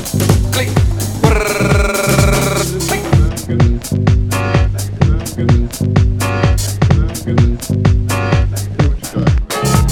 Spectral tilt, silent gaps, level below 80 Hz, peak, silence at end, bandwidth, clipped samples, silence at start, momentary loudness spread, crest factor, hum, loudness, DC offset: -5.5 dB/octave; none; -18 dBFS; 0 dBFS; 0 s; 17.5 kHz; under 0.1%; 0 s; 3 LU; 12 dB; none; -14 LUFS; under 0.1%